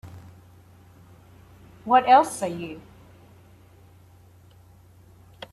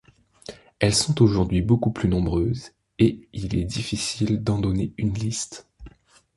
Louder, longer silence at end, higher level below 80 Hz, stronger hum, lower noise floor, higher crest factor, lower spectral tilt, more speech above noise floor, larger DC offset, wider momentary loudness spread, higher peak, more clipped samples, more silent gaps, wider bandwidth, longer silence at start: first, -20 LUFS vs -23 LUFS; first, 2.75 s vs 0.5 s; second, -62 dBFS vs -40 dBFS; neither; about the same, -52 dBFS vs -51 dBFS; about the same, 22 dB vs 20 dB; about the same, -4.5 dB/octave vs -5.5 dB/octave; about the same, 32 dB vs 29 dB; neither; first, 29 LU vs 19 LU; second, -6 dBFS vs -2 dBFS; neither; neither; first, 13.5 kHz vs 11.5 kHz; second, 0.05 s vs 0.5 s